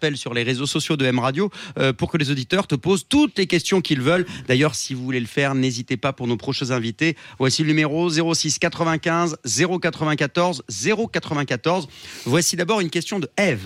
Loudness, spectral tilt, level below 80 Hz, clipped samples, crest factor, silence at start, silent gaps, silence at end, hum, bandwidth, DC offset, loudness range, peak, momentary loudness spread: -21 LUFS; -4.5 dB/octave; -56 dBFS; under 0.1%; 14 dB; 0 s; none; 0 s; none; 16 kHz; under 0.1%; 2 LU; -6 dBFS; 5 LU